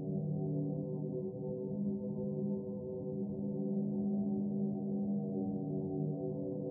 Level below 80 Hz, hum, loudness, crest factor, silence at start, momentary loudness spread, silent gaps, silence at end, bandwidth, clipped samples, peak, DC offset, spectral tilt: -72 dBFS; none; -38 LUFS; 10 dB; 0 s; 4 LU; none; 0 s; 1.1 kHz; under 0.1%; -26 dBFS; under 0.1%; -9 dB/octave